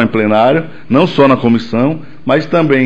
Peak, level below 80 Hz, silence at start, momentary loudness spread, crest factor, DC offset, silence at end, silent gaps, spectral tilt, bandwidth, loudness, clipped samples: 0 dBFS; -48 dBFS; 0 s; 7 LU; 10 dB; 3%; 0 s; none; -8 dB/octave; 8 kHz; -12 LUFS; under 0.1%